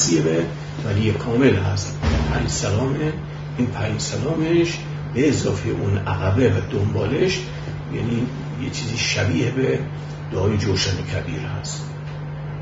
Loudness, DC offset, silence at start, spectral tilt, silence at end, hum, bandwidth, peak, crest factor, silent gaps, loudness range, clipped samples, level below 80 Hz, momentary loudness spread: -22 LUFS; under 0.1%; 0 s; -5.5 dB/octave; 0 s; none; 7.8 kHz; -4 dBFS; 18 dB; none; 2 LU; under 0.1%; -38 dBFS; 10 LU